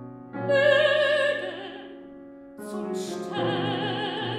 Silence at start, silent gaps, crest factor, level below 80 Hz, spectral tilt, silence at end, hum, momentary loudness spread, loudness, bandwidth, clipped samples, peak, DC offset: 0 s; none; 18 dB; -70 dBFS; -5 dB/octave; 0 s; none; 23 LU; -25 LUFS; 13 kHz; under 0.1%; -8 dBFS; under 0.1%